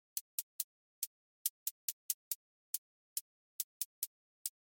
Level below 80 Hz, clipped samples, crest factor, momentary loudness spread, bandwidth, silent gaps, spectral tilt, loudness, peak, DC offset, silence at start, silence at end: under -90 dBFS; under 0.1%; 28 dB; 5 LU; 17 kHz; 0.21-4.45 s; 8.5 dB/octave; -42 LUFS; -18 dBFS; under 0.1%; 0.15 s; 0.2 s